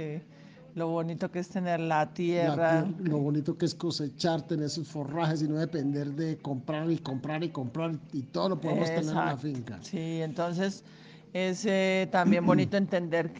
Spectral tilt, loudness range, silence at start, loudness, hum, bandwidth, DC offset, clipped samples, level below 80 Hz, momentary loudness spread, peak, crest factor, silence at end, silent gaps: -6.5 dB/octave; 3 LU; 0 s; -30 LUFS; none; 9.6 kHz; under 0.1%; under 0.1%; -70 dBFS; 10 LU; -10 dBFS; 20 dB; 0 s; none